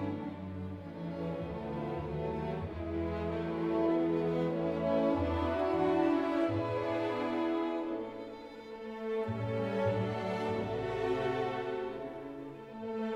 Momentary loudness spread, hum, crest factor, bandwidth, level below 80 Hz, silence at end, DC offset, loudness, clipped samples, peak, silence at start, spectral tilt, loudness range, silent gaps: 12 LU; none; 16 dB; 8.6 kHz; -54 dBFS; 0 s; under 0.1%; -34 LUFS; under 0.1%; -18 dBFS; 0 s; -8 dB/octave; 5 LU; none